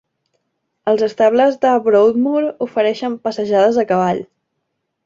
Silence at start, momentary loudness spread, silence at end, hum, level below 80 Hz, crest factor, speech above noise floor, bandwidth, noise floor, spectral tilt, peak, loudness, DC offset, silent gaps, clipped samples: 0.85 s; 9 LU; 0.8 s; none; -62 dBFS; 14 dB; 58 dB; 7.6 kHz; -73 dBFS; -6.5 dB/octave; -2 dBFS; -16 LUFS; under 0.1%; none; under 0.1%